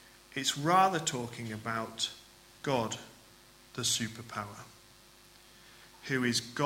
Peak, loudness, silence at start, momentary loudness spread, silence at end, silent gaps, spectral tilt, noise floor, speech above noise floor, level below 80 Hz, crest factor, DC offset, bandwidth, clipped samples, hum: -12 dBFS; -32 LUFS; 0.05 s; 20 LU; 0 s; none; -3 dB/octave; -58 dBFS; 26 dB; -68 dBFS; 22 dB; under 0.1%; 16.5 kHz; under 0.1%; none